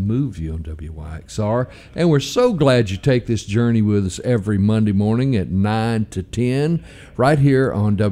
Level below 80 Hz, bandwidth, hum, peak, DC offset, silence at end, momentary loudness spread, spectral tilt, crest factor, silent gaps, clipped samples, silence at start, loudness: -40 dBFS; 13 kHz; none; -4 dBFS; under 0.1%; 0 s; 12 LU; -7 dB/octave; 14 dB; none; under 0.1%; 0 s; -18 LUFS